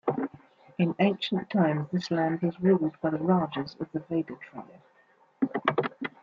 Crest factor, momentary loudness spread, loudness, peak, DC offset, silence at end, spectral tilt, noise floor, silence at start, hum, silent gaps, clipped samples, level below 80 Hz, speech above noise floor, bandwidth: 22 dB; 12 LU; -28 LUFS; -8 dBFS; under 0.1%; 0.15 s; -8 dB/octave; -63 dBFS; 0.05 s; none; none; under 0.1%; -70 dBFS; 36 dB; 7.2 kHz